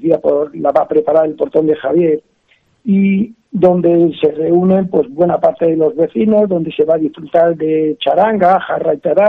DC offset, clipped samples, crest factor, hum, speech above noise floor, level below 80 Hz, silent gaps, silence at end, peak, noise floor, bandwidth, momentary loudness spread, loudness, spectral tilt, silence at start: under 0.1%; under 0.1%; 12 dB; none; 44 dB; -54 dBFS; none; 0 s; 0 dBFS; -56 dBFS; 4.5 kHz; 4 LU; -13 LUFS; -9.5 dB/octave; 0 s